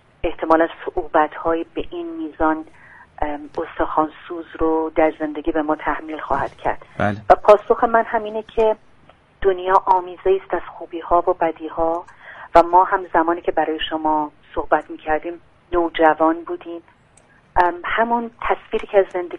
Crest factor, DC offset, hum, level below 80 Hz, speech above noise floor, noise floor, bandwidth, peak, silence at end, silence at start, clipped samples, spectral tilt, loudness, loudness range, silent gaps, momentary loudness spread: 20 dB; under 0.1%; none; -40 dBFS; 34 dB; -53 dBFS; 9 kHz; 0 dBFS; 0 s; 0.25 s; under 0.1%; -6.5 dB/octave; -20 LUFS; 4 LU; none; 13 LU